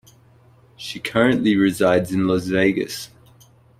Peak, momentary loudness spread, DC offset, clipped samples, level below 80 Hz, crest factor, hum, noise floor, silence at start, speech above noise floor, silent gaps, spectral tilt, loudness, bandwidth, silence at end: -4 dBFS; 15 LU; under 0.1%; under 0.1%; -54 dBFS; 18 dB; none; -52 dBFS; 0.8 s; 33 dB; none; -5.5 dB/octave; -19 LUFS; 16 kHz; 0.75 s